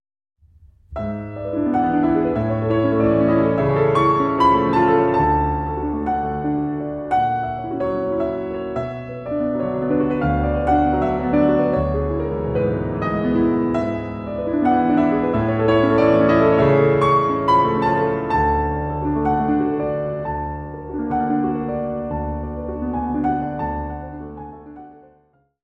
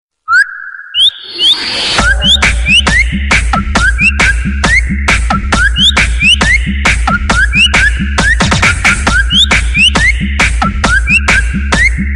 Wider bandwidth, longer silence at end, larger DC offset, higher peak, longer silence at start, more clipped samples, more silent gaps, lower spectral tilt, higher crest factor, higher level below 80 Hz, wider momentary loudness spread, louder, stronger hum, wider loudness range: second, 8.2 kHz vs 11.5 kHz; first, 0.7 s vs 0 s; neither; second, -4 dBFS vs 0 dBFS; first, 0.9 s vs 0.3 s; neither; neither; first, -9 dB/octave vs -3 dB/octave; first, 16 dB vs 10 dB; second, -36 dBFS vs -16 dBFS; first, 12 LU vs 5 LU; second, -19 LUFS vs -8 LUFS; neither; first, 7 LU vs 1 LU